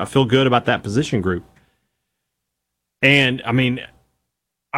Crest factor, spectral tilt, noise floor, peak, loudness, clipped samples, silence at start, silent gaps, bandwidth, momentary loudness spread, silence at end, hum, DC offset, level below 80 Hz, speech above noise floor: 18 dB; -5.5 dB/octave; -79 dBFS; -2 dBFS; -17 LUFS; under 0.1%; 0 s; none; 13.5 kHz; 10 LU; 0 s; none; under 0.1%; -50 dBFS; 61 dB